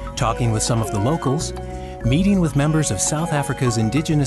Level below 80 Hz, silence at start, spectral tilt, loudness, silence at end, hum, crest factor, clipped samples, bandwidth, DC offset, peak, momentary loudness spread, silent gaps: -34 dBFS; 0 s; -5.5 dB/octave; -20 LUFS; 0 s; none; 14 dB; under 0.1%; 12.5 kHz; under 0.1%; -6 dBFS; 7 LU; none